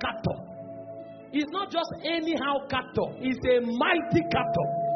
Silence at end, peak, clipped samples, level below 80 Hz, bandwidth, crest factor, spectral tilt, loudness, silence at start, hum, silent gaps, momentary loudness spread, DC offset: 0 s; -10 dBFS; under 0.1%; -56 dBFS; 6.4 kHz; 18 dB; -4 dB/octave; -27 LUFS; 0 s; none; none; 16 LU; under 0.1%